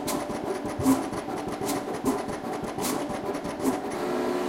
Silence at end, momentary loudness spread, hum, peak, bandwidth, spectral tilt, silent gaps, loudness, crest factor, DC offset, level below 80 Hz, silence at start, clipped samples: 0 s; 7 LU; none; -10 dBFS; 16.5 kHz; -4.5 dB/octave; none; -29 LUFS; 20 dB; under 0.1%; -54 dBFS; 0 s; under 0.1%